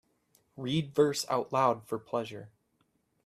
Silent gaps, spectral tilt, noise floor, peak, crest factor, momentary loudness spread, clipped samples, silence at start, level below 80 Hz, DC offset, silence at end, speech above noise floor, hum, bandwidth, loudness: none; -5 dB/octave; -75 dBFS; -12 dBFS; 20 dB; 13 LU; under 0.1%; 0.55 s; -70 dBFS; under 0.1%; 0.75 s; 44 dB; none; 14.5 kHz; -31 LUFS